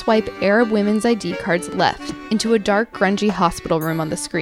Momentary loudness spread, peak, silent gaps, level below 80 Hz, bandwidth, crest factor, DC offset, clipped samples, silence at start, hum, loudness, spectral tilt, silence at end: 6 LU; -2 dBFS; none; -46 dBFS; 17 kHz; 16 dB; under 0.1%; under 0.1%; 0 s; none; -19 LUFS; -5 dB/octave; 0 s